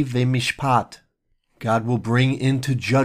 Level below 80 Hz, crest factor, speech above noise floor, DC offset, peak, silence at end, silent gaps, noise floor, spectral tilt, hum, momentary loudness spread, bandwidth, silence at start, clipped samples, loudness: -54 dBFS; 16 dB; 48 dB; under 0.1%; -6 dBFS; 0 s; none; -68 dBFS; -6 dB/octave; none; 4 LU; 15 kHz; 0 s; under 0.1%; -21 LUFS